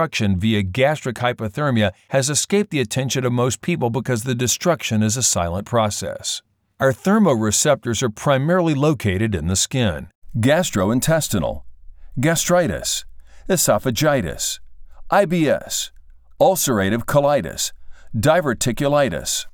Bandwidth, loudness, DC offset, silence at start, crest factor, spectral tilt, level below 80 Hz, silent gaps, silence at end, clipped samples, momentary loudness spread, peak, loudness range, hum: over 20 kHz; -19 LUFS; under 0.1%; 0 s; 16 dB; -4.5 dB/octave; -44 dBFS; 10.15-10.22 s; 0.05 s; under 0.1%; 8 LU; -4 dBFS; 2 LU; none